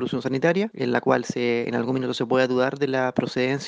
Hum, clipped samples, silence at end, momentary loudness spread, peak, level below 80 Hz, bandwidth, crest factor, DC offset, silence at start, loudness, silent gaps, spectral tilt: none; under 0.1%; 0 s; 4 LU; -4 dBFS; -66 dBFS; 9.2 kHz; 18 dB; under 0.1%; 0 s; -23 LUFS; none; -6 dB/octave